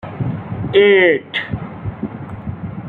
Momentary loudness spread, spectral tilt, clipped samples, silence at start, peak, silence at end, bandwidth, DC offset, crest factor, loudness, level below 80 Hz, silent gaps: 17 LU; -8.5 dB/octave; under 0.1%; 0.05 s; -2 dBFS; 0 s; 4.4 kHz; under 0.1%; 16 dB; -16 LUFS; -44 dBFS; none